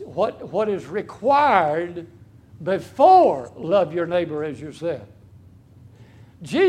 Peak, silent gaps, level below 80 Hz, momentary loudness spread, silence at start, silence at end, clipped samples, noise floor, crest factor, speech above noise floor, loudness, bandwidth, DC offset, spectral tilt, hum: 0 dBFS; none; -60 dBFS; 17 LU; 0 s; 0 s; under 0.1%; -48 dBFS; 20 dB; 28 dB; -20 LUFS; 11 kHz; under 0.1%; -6.5 dB/octave; none